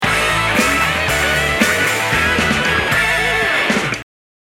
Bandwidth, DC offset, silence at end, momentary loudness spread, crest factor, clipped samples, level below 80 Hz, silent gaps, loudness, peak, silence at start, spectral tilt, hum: 18 kHz; under 0.1%; 0.5 s; 2 LU; 16 dB; under 0.1%; -34 dBFS; none; -14 LUFS; 0 dBFS; 0 s; -3 dB/octave; none